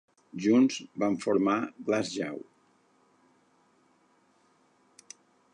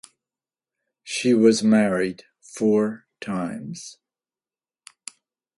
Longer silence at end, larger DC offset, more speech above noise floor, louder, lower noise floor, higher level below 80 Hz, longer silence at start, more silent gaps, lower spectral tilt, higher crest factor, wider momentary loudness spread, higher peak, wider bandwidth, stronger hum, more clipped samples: first, 3.1 s vs 1.65 s; neither; second, 39 dB vs over 69 dB; second, -28 LUFS vs -21 LUFS; second, -67 dBFS vs under -90 dBFS; second, -76 dBFS vs -66 dBFS; second, 0.35 s vs 1.05 s; neither; about the same, -5.5 dB/octave vs -5 dB/octave; about the same, 18 dB vs 20 dB; about the same, 26 LU vs 24 LU; second, -12 dBFS vs -4 dBFS; about the same, 10.5 kHz vs 11.5 kHz; neither; neither